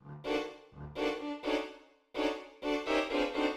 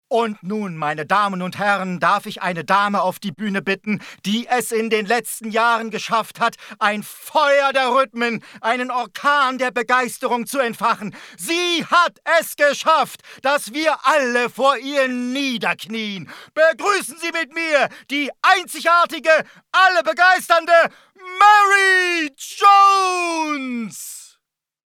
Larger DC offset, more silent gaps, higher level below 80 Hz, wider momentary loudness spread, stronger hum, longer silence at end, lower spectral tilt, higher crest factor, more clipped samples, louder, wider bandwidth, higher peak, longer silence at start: neither; neither; first, -60 dBFS vs -74 dBFS; about the same, 13 LU vs 11 LU; neither; second, 0 s vs 0.65 s; first, -4.5 dB/octave vs -3 dB/octave; about the same, 16 dB vs 18 dB; neither; second, -35 LUFS vs -18 LUFS; second, 13.5 kHz vs 18.5 kHz; second, -18 dBFS vs 0 dBFS; about the same, 0.05 s vs 0.1 s